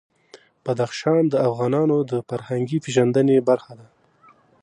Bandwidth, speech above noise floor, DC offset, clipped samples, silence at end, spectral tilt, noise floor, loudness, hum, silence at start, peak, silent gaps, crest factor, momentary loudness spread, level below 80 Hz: 11 kHz; 35 dB; under 0.1%; under 0.1%; 0.8 s; -7 dB/octave; -55 dBFS; -21 LUFS; none; 0.35 s; -4 dBFS; none; 18 dB; 9 LU; -68 dBFS